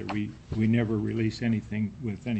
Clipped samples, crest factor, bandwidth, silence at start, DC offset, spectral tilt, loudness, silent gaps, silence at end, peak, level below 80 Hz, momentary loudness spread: under 0.1%; 16 dB; 8.4 kHz; 0 s; under 0.1%; -8 dB/octave; -29 LUFS; none; 0 s; -12 dBFS; -50 dBFS; 8 LU